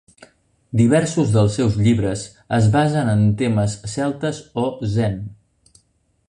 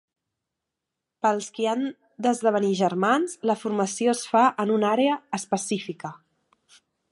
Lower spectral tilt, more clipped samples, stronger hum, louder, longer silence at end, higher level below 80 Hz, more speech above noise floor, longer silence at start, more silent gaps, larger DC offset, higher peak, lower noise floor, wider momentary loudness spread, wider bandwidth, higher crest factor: first, -7 dB/octave vs -4.5 dB/octave; neither; neither; first, -19 LUFS vs -24 LUFS; about the same, 0.95 s vs 0.95 s; first, -44 dBFS vs -76 dBFS; second, 46 dB vs 61 dB; second, 0.75 s vs 1.25 s; neither; neither; about the same, -4 dBFS vs -6 dBFS; second, -64 dBFS vs -85 dBFS; about the same, 9 LU vs 8 LU; about the same, 10.5 kHz vs 11.5 kHz; about the same, 16 dB vs 18 dB